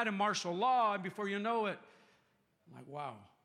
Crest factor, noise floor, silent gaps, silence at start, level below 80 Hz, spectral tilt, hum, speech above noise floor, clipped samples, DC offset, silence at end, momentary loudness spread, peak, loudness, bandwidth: 16 dB; -75 dBFS; none; 0 s; -90 dBFS; -4 dB/octave; none; 39 dB; under 0.1%; under 0.1%; 0.2 s; 15 LU; -20 dBFS; -35 LUFS; 13 kHz